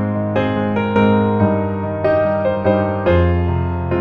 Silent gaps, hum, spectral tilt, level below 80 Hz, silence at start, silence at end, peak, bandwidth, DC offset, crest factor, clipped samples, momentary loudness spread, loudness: none; none; -10 dB/octave; -34 dBFS; 0 s; 0 s; 0 dBFS; 5.2 kHz; under 0.1%; 16 dB; under 0.1%; 5 LU; -17 LUFS